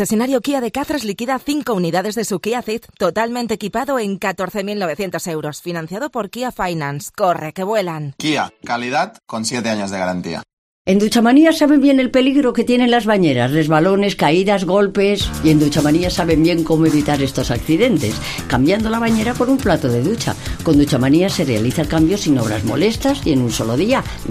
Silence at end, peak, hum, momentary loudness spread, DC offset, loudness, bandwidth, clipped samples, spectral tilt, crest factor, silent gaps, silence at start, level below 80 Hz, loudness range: 0 s; -2 dBFS; none; 9 LU; under 0.1%; -17 LUFS; 15.5 kHz; under 0.1%; -5.5 dB/octave; 16 dB; 10.53-10.85 s; 0 s; -38 dBFS; 8 LU